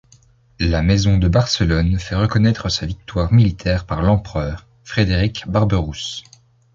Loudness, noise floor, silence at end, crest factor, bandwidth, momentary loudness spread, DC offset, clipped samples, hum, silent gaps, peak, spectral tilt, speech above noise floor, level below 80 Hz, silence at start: -18 LUFS; -52 dBFS; 0.55 s; 16 dB; 7.6 kHz; 10 LU; under 0.1%; under 0.1%; none; none; -2 dBFS; -6 dB/octave; 35 dB; -28 dBFS; 0.6 s